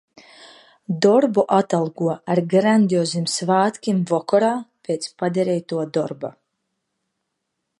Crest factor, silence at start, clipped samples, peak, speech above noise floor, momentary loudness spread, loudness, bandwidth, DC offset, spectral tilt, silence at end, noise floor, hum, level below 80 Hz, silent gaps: 18 dB; 0.4 s; under 0.1%; -2 dBFS; 58 dB; 11 LU; -20 LUFS; 11.5 kHz; under 0.1%; -5.5 dB/octave; 1.5 s; -77 dBFS; none; -70 dBFS; none